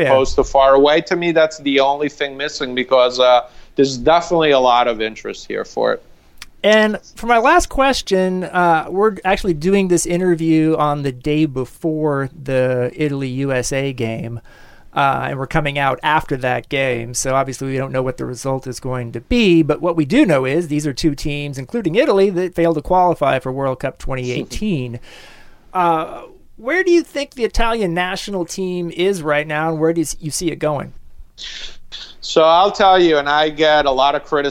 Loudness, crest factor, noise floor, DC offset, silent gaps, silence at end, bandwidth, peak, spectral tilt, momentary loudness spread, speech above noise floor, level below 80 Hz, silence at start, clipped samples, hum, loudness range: -17 LUFS; 14 dB; -40 dBFS; under 0.1%; none; 0 s; 16.5 kHz; -2 dBFS; -5 dB/octave; 12 LU; 24 dB; -36 dBFS; 0 s; under 0.1%; none; 5 LU